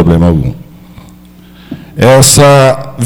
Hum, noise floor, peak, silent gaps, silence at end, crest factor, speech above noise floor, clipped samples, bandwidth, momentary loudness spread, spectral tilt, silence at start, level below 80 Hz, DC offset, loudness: 60 Hz at -35 dBFS; -35 dBFS; 0 dBFS; none; 0 s; 8 dB; 29 dB; 1%; over 20 kHz; 22 LU; -4.5 dB/octave; 0 s; -28 dBFS; under 0.1%; -5 LUFS